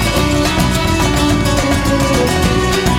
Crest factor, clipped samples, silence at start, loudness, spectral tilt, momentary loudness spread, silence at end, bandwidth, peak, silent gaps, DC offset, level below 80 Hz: 14 dB; under 0.1%; 0 s; -13 LUFS; -4.5 dB/octave; 1 LU; 0 s; 20 kHz; 0 dBFS; none; under 0.1%; -22 dBFS